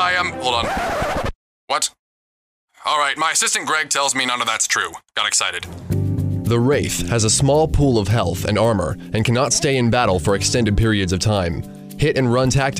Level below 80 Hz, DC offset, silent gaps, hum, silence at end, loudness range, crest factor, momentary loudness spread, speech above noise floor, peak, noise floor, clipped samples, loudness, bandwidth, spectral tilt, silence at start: -34 dBFS; under 0.1%; 1.35-1.68 s, 1.99-2.68 s; none; 0 s; 3 LU; 14 dB; 7 LU; over 72 dB; -4 dBFS; under -90 dBFS; under 0.1%; -18 LUFS; 15.5 kHz; -4 dB/octave; 0 s